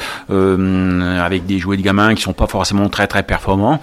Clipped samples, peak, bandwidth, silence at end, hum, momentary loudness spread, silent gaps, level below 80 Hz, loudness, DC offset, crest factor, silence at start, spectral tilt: under 0.1%; 0 dBFS; 15 kHz; 0 s; none; 5 LU; none; -30 dBFS; -15 LUFS; under 0.1%; 14 dB; 0 s; -5.5 dB/octave